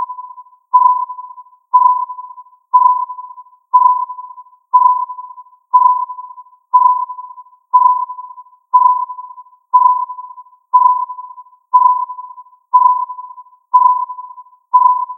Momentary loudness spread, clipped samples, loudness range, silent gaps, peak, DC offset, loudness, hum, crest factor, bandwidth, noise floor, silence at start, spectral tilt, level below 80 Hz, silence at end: 23 LU; under 0.1%; 0 LU; none; 0 dBFS; under 0.1%; -13 LUFS; none; 14 dB; 1.2 kHz; -36 dBFS; 0 s; 0.5 dB/octave; under -90 dBFS; 0 s